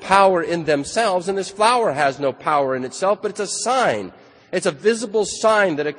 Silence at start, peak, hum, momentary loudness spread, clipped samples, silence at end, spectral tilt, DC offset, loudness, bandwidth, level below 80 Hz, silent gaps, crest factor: 0 s; 0 dBFS; none; 7 LU; under 0.1%; 0 s; -3.5 dB/octave; under 0.1%; -19 LUFS; 10 kHz; -58 dBFS; none; 20 dB